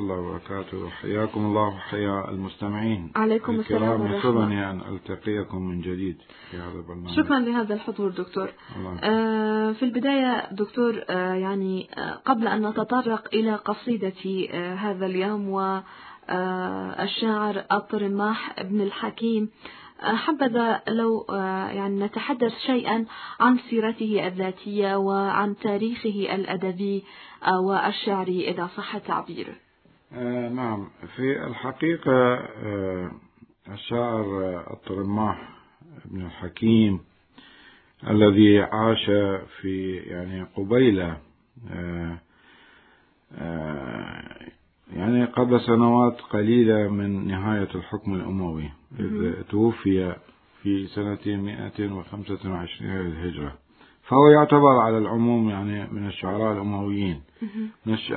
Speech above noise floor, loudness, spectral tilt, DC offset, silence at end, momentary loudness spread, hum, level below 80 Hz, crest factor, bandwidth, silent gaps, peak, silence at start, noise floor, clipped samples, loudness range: 35 dB; -24 LUFS; -11 dB/octave; under 0.1%; 0 s; 14 LU; none; -58 dBFS; 22 dB; 4.5 kHz; none; -2 dBFS; 0 s; -59 dBFS; under 0.1%; 8 LU